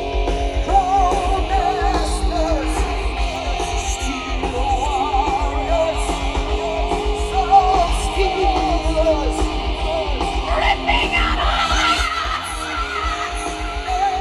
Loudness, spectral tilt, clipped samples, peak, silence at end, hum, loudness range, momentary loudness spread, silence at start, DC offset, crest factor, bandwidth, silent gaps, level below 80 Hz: -19 LUFS; -4.5 dB/octave; under 0.1%; -2 dBFS; 0 s; none; 3 LU; 7 LU; 0 s; under 0.1%; 16 dB; 12 kHz; none; -24 dBFS